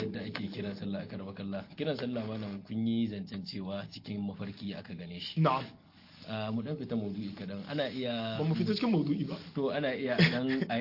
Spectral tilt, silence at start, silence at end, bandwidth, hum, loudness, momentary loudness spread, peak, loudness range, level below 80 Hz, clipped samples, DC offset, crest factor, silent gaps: -8 dB/octave; 0 s; 0 s; 5.8 kHz; none; -34 LUFS; 11 LU; -10 dBFS; 5 LU; -70 dBFS; under 0.1%; under 0.1%; 22 dB; none